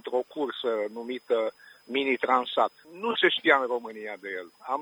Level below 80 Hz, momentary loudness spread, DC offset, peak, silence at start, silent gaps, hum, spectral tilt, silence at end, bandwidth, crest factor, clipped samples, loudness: -80 dBFS; 14 LU; under 0.1%; -6 dBFS; 0.05 s; none; none; -4 dB/octave; 0 s; over 20 kHz; 22 dB; under 0.1%; -27 LUFS